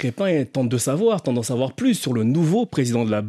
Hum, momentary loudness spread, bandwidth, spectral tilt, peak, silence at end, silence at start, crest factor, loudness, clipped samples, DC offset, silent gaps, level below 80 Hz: none; 3 LU; 14.5 kHz; -6 dB/octave; -8 dBFS; 0 s; 0 s; 12 dB; -21 LUFS; under 0.1%; under 0.1%; none; -64 dBFS